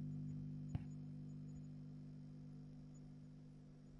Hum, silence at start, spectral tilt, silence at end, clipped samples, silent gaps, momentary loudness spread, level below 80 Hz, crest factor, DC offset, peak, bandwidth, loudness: 50 Hz at -55 dBFS; 0 s; -9 dB/octave; 0 s; under 0.1%; none; 10 LU; -68 dBFS; 20 dB; under 0.1%; -32 dBFS; 7.4 kHz; -53 LUFS